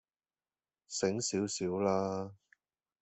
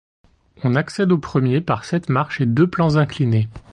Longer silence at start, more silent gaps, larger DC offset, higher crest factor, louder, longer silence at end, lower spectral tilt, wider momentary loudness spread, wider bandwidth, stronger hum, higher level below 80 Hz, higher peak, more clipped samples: first, 0.9 s vs 0.6 s; neither; neither; first, 20 dB vs 14 dB; second, -34 LUFS vs -19 LUFS; first, 0.7 s vs 0.15 s; second, -4.5 dB/octave vs -8 dB/octave; first, 9 LU vs 5 LU; second, 8.4 kHz vs 9.8 kHz; neither; second, -76 dBFS vs -48 dBFS; second, -18 dBFS vs -4 dBFS; neither